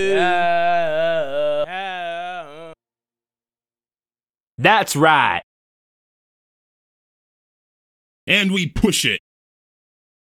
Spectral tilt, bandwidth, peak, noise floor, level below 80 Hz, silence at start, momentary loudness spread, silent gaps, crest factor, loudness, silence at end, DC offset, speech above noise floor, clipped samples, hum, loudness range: -3.5 dB/octave; 18 kHz; 0 dBFS; under -90 dBFS; -44 dBFS; 0 s; 13 LU; 4.43-4.47 s, 4.54-4.58 s, 5.43-8.27 s; 22 dB; -18 LUFS; 1.05 s; under 0.1%; over 74 dB; under 0.1%; none; 7 LU